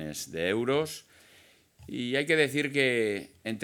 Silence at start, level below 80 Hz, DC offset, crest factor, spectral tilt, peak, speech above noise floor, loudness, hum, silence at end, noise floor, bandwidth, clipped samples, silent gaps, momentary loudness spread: 0 s; -68 dBFS; under 0.1%; 20 dB; -4 dB/octave; -10 dBFS; 31 dB; -28 LUFS; none; 0 s; -60 dBFS; 19 kHz; under 0.1%; none; 12 LU